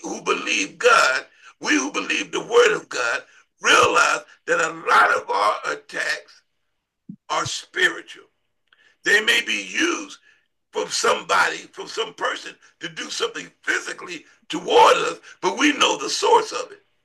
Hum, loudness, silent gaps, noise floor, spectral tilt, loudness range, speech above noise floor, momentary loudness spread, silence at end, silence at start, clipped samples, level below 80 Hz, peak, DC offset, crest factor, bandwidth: none; -20 LUFS; none; -76 dBFS; -1.5 dB/octave; 6 LU; 55 dB; 16 LU; 0.3 s; 0.05 s; under 0.1%; -70 dBFS; -2 dBFS; under 0.1%; 20 dB; 12.5 kHz